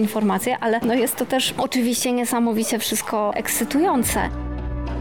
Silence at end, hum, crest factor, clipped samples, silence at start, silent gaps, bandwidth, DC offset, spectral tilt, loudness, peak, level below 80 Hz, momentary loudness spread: 0 s; none; 12 dB; under 0.1%; 0 s; none; over 20 kHz; 0.3%; -3.5 dB/octave; -21 LUFS; -10 dBFS; -36 dBFS; 6 LU